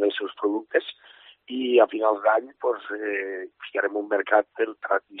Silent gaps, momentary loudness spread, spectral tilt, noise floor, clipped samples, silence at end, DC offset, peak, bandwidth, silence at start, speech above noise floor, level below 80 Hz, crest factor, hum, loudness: none; 10 LU; 0.5 dB/octave; -44 dBFS; under 0.1%; 0 s; under 0.1%; -4 dBFS; 4.1 kHz; 0 s; 19 dB; -82 dBFS; 20 dB; none; -25 LUFS